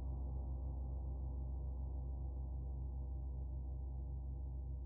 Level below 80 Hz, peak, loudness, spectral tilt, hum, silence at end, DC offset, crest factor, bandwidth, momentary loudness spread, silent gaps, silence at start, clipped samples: -44 dBFS; -34 dBFS; -46 LUFS; -10 dB/octave; none; 0 s; under 0.1%; 8 dB; 1.2 kHz; 2 LU; none; 0 s; under 0.1%